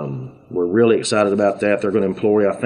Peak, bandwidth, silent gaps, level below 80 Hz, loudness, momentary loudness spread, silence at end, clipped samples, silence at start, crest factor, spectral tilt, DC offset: -4 dBFS; 11 kHz; none; -60 dBFS; -17 LUFS; 11 LU; 0 s; under 0.1%; 0 s; 14 dB; -5.5 dB/octave; under 0.1%